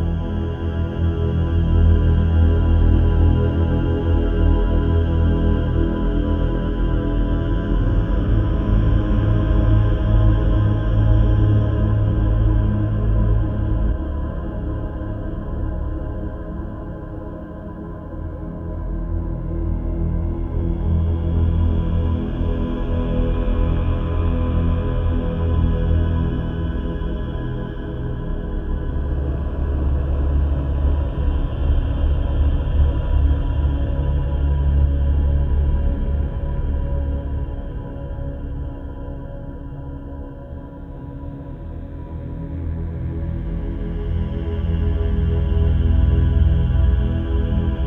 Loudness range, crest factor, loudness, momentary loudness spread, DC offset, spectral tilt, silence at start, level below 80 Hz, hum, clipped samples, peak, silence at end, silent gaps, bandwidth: 12 LU; 16 dB; -21 LUFS; 14 LU; under 0.1%; -10.5 dB/octave; 0 s; -22 dBFS; none; under 0.1%; -4 dBFS; 0 s; none; 3.7 kHz